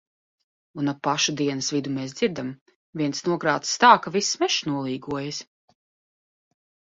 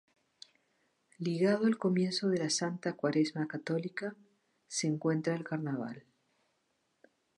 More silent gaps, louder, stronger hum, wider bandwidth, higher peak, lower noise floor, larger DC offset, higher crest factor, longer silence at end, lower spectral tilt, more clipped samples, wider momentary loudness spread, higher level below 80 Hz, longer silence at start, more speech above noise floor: first, 2.61-2.66 s, 2.76-2.93 s vs none; first, -23 LUFS vs -33 LUFS; neither; second, 8 kHz vs 11.5 kHz; first, -2 dBFS vs -16 dBFS; first, under -90 dBFS vs -78 dBFS; neither; first, 24 dB vs 18 dB; about the same, 1.45 s vs 1.4 s; second, -3.5 dB/octave vs -5 dB/octave; neither; first, 16 LU vs 10 LU; first, -66 dBFS vs -82 dBFS; second, 0.75 s vs 1.2 s; first, over 66 dB vs 46 dB